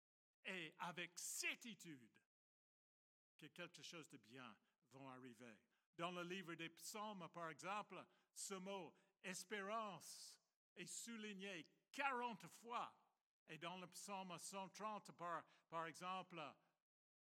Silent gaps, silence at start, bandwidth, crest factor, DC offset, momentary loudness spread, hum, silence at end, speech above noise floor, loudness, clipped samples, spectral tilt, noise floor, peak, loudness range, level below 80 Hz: 2.26-3.39 s, 5.86-5.93 s, 10.56-10.76 s, 13.26-13.46 s; 0.45 s; 16 kHz; 24 dB; under 0.1%; 14 LU; none; 0.7 s; over 36 dB; -53 LUFS; under 0.1%; -2.5 dB/octave; under -90 dBFS; -32 dBFS; 9 LU; under -90 dBFS